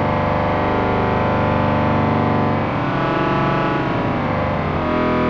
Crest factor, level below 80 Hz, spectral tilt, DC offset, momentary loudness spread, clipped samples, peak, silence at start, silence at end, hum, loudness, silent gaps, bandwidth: 12 dB; -34 dBFS; -8.5 dB/octave; under 0.1%; 3 LU; under 0.1%; -6 dBFS; 0 s; 0 s; none; -18 LUFS; none; 7 kHz